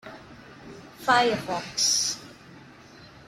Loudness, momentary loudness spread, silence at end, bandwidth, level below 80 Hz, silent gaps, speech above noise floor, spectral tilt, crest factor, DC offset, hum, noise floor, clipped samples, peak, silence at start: -24 LUFS; 24 LU; 0.2 s; 16.5 kHz; -62 dBFS; none; 25 dB; -1 dB/octave; 22 dB; under 0.1%; none; -49 dBFS; under 0.1%; -6 dBFS; 0.05 s